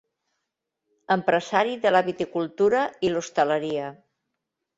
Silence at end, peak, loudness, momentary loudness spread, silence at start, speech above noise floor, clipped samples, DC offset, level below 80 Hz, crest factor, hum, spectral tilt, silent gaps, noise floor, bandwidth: 0.85 s; -6 dBFS; -24 LUFS; 7 LU; 1.1 s; 59 dB; under 0.1%; under 0.1%; -64 dBFS; 20 dB; none; -5 dB/octave; none; -82 dBFS; 8 kHz